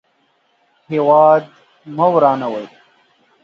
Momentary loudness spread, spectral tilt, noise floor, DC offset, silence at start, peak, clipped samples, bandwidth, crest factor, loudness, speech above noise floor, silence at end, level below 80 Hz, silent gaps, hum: 18 LU; -8.5 dB/octave; -61 dBFS; under 0.1%; 0.9 s; 0 dBFS; under 0.1%; 6.4 kHz; 16 dB; -14 LUFS; 47 dB; 0.75 s; -68 dBFS; none; none